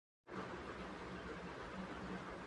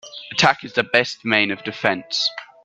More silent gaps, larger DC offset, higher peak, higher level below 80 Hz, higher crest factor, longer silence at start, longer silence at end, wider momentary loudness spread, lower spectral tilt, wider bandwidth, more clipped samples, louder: neither; neither; second, -36 dBFS vs 0 dBFS; about the same, -62 dBFS vs -62 dBFS; second, 14 dB vs 22 dB; first, 0.25 s vs 0.05 s; second, 0 s vs 0.2 s; second, 1 LU vs 5 LU; first, -6 dB/octave vs -3 dB/octave; about the same, 11 kHz vs 11.5 kHz; neither; second, -49 LUFS vs -19 LUFS